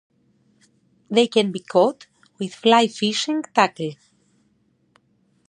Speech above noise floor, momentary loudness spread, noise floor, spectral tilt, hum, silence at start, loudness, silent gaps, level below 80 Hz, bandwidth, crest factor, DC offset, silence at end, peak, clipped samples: 44 dB; 15 LU; -64 dBFS; -4 dB/octave; none; 1.1 s; -20 LUFS; none; -74 dBFS; 10.5 kHz; 22 dB; under 0.1%; 1.55 s; -2 dBFS; under 0.1%